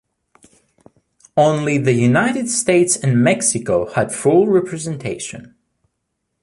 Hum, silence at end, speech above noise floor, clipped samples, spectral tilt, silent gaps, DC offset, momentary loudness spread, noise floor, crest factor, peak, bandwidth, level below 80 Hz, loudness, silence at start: none; 0.95 s; 58 dB; under 0.1%; -5 dB/octave; none; under 0.1%; 11 LU; -74 dBFS; 16 dB; -2 dBFS; 11.5 kHz; -54 dBFS; -16 LUFS; 1.35 s